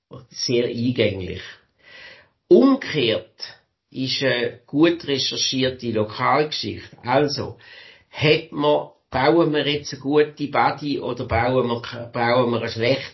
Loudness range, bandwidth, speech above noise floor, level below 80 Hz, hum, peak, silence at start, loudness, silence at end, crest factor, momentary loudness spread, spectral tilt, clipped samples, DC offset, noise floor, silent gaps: 2 LU; 6.2 kHz; 26 dB; -48 dBFS; none; -4 dBFS; 0.1 s; -21 LUFS; 0.05 s; 18 dB; 14 LU; -5 dB/octave; under 0.1%; under 0.1%; -46 dBFS; none